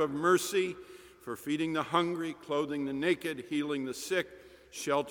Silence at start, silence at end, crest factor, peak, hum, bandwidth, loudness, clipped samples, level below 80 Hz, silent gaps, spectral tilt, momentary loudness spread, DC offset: 0 s; 0 s; 20 dB; -12 dBFS; none; 19 kHz; -32 LUFS; under 0.1%; -70 dBFS; none; -4 dB/octave; 16 LU; under 0.1%